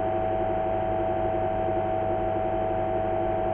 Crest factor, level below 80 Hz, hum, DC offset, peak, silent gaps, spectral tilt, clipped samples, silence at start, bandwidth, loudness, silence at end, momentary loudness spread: 12 dB; -42 dBFS; 50 Hz at -40 dBFS; under 0.1%; -14 dBFS; none; -10 dB/octave; under 0.1%; 0 s; 3.8 kHz; -27 LUFS; 0 s; 0 LU